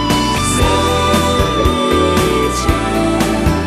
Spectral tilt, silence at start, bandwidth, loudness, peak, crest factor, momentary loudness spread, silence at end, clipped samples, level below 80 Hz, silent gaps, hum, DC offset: -4.5 dB/octave; 0 s; 14 kHz; -14 LUFS; 0 dBFS; 14 dB; 2 LU; 0 s; under 0.1%; -22 dBFS; none; none; under 0.1%